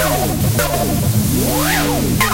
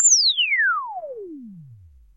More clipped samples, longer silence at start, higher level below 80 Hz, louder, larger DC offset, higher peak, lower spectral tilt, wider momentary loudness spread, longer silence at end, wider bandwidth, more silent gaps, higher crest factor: neither; about the same, 0 s vs 0 s; first, -28 dBFS vs -60 dBFS; about the same, -16 LUFS vs -17 LUFS; neither; first, -2 dBFS vs -6 dBFS; first, -4.5 dB/octave vs 2 dB/octave; second, 2 LU vs 23 LU; second, 0 s vs 0.4 s; first, 16 kHz vs 8.8 kHz; neither; about the same, 14 dB vs 16 dB